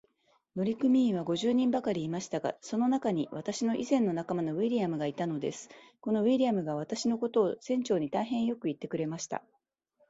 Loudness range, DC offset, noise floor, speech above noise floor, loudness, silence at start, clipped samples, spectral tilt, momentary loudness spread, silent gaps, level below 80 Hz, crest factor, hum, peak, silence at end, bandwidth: 2 LU; under 0.1%; -72 dBFS; 42 dB; -31 LUFS; 0.55 s; under 0.1%; -6 dB/octave; 9 LU; none; -72 dBFS; 16 dB; none; -14 dBFS; 0.7 s; 8 kHz